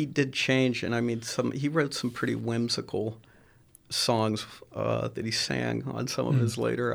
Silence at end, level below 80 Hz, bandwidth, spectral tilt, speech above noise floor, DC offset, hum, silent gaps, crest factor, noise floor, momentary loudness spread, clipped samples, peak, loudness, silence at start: 0 s; -62 dBFS; over 20 kHz; -5 dB/octave; 30 dB; under 0.1%; none; none; 18 dB; -58 dBFS; 7 LU; under 0.1%; -12 dBFS; -29 LUFS; 0 s